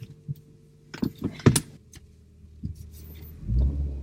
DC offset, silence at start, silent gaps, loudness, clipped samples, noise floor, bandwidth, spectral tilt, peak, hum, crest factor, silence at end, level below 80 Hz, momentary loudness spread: under 0.1%; 0 s; none; -28 LUFS; under 0.1%; -53 dBFS; 16 kHz; -5.5 dB/octave; -2 dBFS; none; 26 dB; 0 s; -34 dBFS; 22 LU